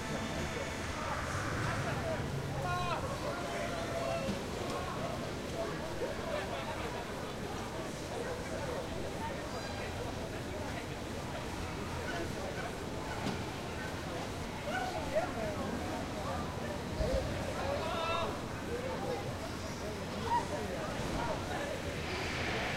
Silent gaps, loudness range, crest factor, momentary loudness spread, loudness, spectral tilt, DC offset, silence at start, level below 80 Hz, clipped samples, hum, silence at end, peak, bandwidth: none; 3 LU; 16 dB; 5 LU; -38 LUFS; -5 dB/octave; under 0.1%; 0 s; -50 dBFS; under 0.1%; none; 0 s; -20 dBFS; 16 kHz